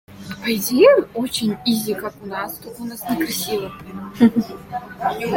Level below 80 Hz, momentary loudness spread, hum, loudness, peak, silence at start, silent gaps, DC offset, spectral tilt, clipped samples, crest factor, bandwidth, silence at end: -54 dBFS; 18 LU; none; -20 LUFS; -2 dBFS; 0.1 s; none; under 0.1%; -4.5 dB/octave; under 0.1%; 18 dB; 17 kHz; 0 s